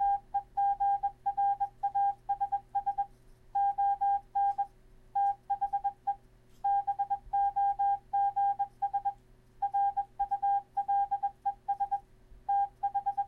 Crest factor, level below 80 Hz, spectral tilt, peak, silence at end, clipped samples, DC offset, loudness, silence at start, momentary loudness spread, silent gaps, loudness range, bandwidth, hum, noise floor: 8 dB; -60 dBFS; -5 dB/octave; -22 dBFS; 0 s; under 0.1%; under 0.1%; -32 LUFS; 0 s; 8 LU; none; 1 LU; 3.4 kHz; none; -57 dBFS